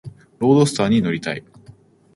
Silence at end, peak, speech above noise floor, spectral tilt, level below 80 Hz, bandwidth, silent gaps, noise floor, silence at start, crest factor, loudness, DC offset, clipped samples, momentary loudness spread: 0.45 s; -2 dBFS; 30 dB; -6 dB/octave; -56 dBFS; 11.5 kHz; none; -48 dBFS; 0.05 s; 18 dB; -18 LUFS; under 0.1%; under 0.1%; 12 LU